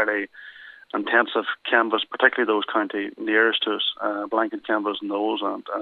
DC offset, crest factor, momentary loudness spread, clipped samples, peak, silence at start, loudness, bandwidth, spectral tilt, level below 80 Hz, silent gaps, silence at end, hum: under 0.1%; 22 dB; 9 LU; under 0.1%; -2 dBFS; 0 s; -23 LUFS; 4.6 kHz; -6 dB/octave; -76 dBFS; none; 0 s; none